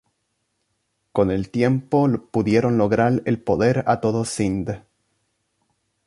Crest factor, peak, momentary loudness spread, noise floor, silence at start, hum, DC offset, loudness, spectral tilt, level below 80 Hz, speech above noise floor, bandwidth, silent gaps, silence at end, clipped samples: 18 dB; -4 dBFS; 6 LU; -73 dBFS; 1.15 s; none; under 0.1%; -21 LUFS; -7 dB/octave; -48 dBFS; 53 dB; 11.5 kHz; none; 1.3 s; under 0.1%